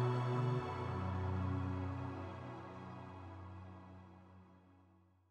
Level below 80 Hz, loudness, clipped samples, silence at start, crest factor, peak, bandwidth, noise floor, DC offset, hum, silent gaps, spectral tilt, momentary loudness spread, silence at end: -66 dBFS; -42 LUFS; under 0.1%; 0 s; 16 dB; -26 dBFS; 8.2 kHz; -69 dBFS; under 0.1%; none; none; -8.5 dB/octave; 21 LU; 0.5 s